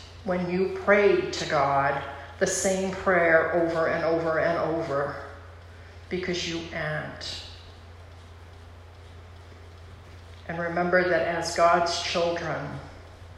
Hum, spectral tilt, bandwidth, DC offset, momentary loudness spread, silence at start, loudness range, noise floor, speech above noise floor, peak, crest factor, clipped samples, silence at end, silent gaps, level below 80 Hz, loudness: none; -4 dB/octave; 13 kHz; under 0.1%; 25 LU; 0 s; 14 LU; -46 dBFS; 21 dB; -8 dBFS; 18 dB; under 0.1%; 0 s; none; -54 dBFS; -25 LUFS